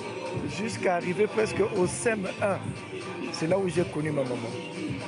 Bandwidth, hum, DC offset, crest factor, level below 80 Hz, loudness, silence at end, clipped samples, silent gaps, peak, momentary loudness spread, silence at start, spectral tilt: 11.5 kHz; none; under 0.1%; 16 dB; -62 dBFS; -29 LUFS; 0 s; under 0.1%; none; -12 dBFS; 9 LU; 0 s; -5.5 dB/octave